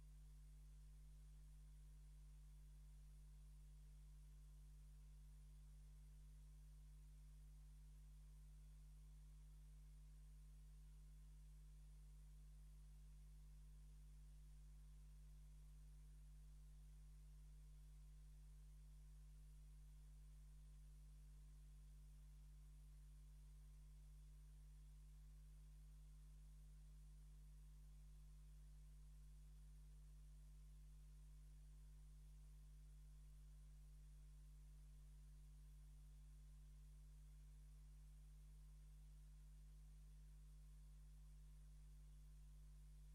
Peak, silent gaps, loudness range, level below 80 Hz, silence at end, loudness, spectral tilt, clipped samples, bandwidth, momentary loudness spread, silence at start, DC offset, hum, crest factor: -56 dBFS; none; 0 LU; -62 dBFS; 0 s; -67 LUFS; -5.5 dB/octave; under 0.1%; 12.5 kHz; 0 LU; 0 s; under 0.1%; 50 Hz at -65 dBFS; 6 dB